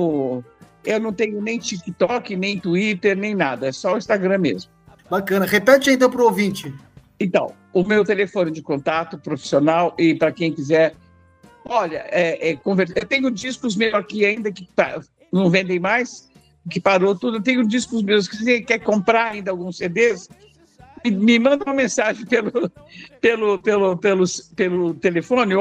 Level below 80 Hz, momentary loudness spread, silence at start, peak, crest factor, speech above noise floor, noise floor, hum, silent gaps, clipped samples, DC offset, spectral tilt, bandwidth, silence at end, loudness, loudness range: -60 dBFS; 8 LU; 0 s; 0 dBFS; 18 dB; 31 dB; -50 dBFS; none; none; under 0.1%; under 0.1%; -5 dB/octave; 15.5 kHz; 0 s; -19 LUFS; 3 LU